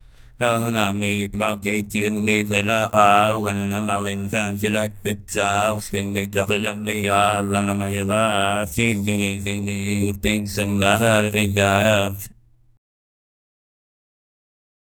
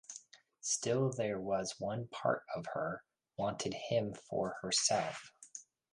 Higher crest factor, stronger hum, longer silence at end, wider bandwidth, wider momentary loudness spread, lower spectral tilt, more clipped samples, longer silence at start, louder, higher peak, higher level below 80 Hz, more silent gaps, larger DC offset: about the same, 22 dB vs 20 dB; neither; first, 2.65 s vs 0.3 s; first, 19.5 kHz vs 11.5 kHz; second, 7 LU vs 18 LU; about the same, -4.5 dB/octave vs -3.5 dB/octave; neither; first, 0.25 s vs 0.1 s; first, -20 LUFS vs -36 LUFS; first, 0 dBFS vs -16 dBFS; first, -46 dBFS vs -72 dBFS; neither; neither